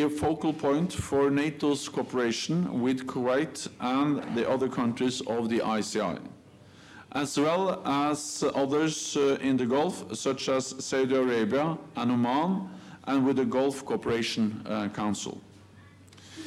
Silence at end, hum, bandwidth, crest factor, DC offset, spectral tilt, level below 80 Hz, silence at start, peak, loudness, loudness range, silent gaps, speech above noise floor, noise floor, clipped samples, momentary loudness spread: 0 s; none; 13.5 kHz; 12 dB; under 0.1%; -5 dB/octave; -64 dBFS; 0 s; -16 dBFS; -28 LUFS; 2 LU; none; 25 dB; -53 dBFS; under 0.1%; 7 LU